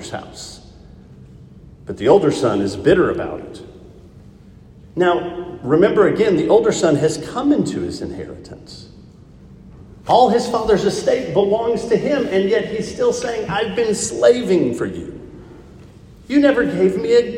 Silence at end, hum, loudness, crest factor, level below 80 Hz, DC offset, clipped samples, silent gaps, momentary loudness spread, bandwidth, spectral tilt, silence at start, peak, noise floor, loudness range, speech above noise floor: 0 s; none; -17 LUFS; 18 dB; -46 dBFS; under 0.1%; under 0.1%; none; 20 LU; 12 kHz; -5.5 dB/octave; 0 s; 0 dBFS; -43 dBFS; 4 LU; 26 dB